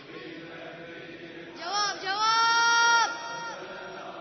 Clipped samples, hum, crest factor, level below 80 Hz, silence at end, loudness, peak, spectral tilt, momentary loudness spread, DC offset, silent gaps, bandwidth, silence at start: under 0.1%; none; 16 dB; -72 dBFS; 0 s; -24 LUFS; -12 dBFS; -0.5 dB/octave; 21 LU; under 0.1%; none; 6.4 kHz; 0 s